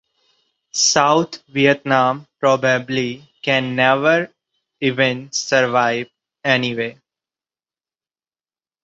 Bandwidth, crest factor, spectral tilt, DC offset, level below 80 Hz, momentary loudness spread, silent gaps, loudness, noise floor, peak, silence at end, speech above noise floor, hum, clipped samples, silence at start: 8 kHz; 20 dB; -3.5 dB/octave; under 0.1%; -62 dBFS; 11 LU; none; -18 LUFS; under -90 dBFS; 0 dBFS; 1.9 s; over 73 dB; none; under 0.1%; 0.75 s